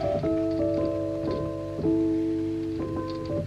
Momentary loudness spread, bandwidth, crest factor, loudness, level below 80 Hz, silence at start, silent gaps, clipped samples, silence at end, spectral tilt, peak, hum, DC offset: 6 LU; 7.8 kHz; 12 dB; -28 LUFS; -46 dBFS; 0 s; none; under 0.1%; 0 s; -8.5 dB/octave; -16 dBFS; none; under 0.1%